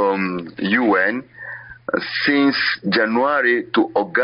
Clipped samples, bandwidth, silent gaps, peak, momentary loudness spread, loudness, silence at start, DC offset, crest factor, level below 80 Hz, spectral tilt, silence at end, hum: under 0.1%; 5.6 kHz; none; -6 dBFS; 13 LU; -18 LUFS; 0 s; under 0.1%; 14 dB; -60 dBFS; -2.5 dB/octave; 0 s; none